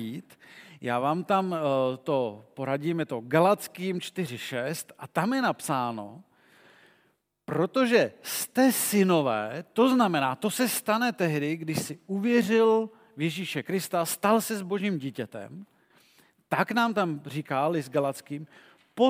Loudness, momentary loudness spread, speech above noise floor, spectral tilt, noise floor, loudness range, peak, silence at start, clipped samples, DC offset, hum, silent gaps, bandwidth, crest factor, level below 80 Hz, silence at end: -27 LUFS; 14 LU; 43 dB; -5 dB/octave; -70 dBFS; 6 LU; -8 dBFS; 0 s; under 0.1%; under 0.1%; none; none; 16.5 kHz; 20 dB; -78 dBFS; 0 s